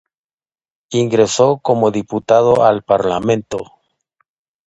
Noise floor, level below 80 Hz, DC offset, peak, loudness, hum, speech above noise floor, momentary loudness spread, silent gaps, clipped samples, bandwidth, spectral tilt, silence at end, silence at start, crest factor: under -90 dBFS; -52 dBFS; under 0.1%; 0 dBFS; -15 LUFS; none; over 76 dB; 10 LU; none; under 0.1%; 9 kHz; -5.5 dB/octave; 1.05 s; 0.9 s; 16 dB